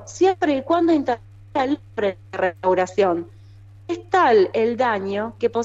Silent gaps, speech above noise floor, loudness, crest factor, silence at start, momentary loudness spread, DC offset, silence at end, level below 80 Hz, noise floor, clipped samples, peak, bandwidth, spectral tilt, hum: none; 24 dB; -21 LUFS; 14 dB; 0 s; 11 LU; under 0.1%; 0 s; -56 dBFS; -44 dBFS; under 0.1%; -6 dBFS; 8 kHz; -5.5 dB/octave; none